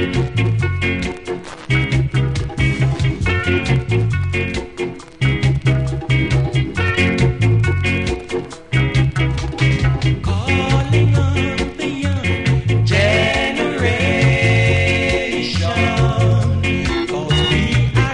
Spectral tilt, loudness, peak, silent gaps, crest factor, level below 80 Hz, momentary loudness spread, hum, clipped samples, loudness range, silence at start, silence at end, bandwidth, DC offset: -6 dB/octave; -17 LUFS; -2 dBFS; none; 14 dB; -26 dBFS; 7 LU; none; under 0.1%; 3 LU; 0 s; 0 s; 10.5 kHz; under 0.1%